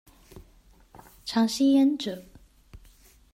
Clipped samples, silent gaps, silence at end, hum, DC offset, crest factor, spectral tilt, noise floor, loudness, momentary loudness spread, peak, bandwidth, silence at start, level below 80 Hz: under 0.1%; none; 0.55 s; none; under 0.1%; 16 dB; -4.5 dB/octave; -57 dBFS; -24 LUFS; 18 LU; -14 dBFS; 15 kHz; 0.35 s; -58 dBFS